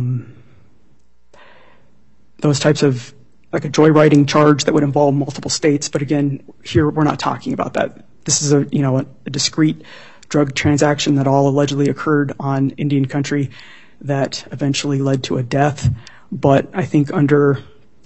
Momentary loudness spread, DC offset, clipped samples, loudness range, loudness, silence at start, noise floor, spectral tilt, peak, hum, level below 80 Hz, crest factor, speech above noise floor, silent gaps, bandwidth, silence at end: 10 LU; 0.7%; under 0.1%; 5 LU; -16 LUFS; 0 s; -58 dBFS; -5.5 dB/octave; 0 dBFS; none; -50 dBFS; 16 dB; 42 dB; none; 8.4 kHz; 0.4 s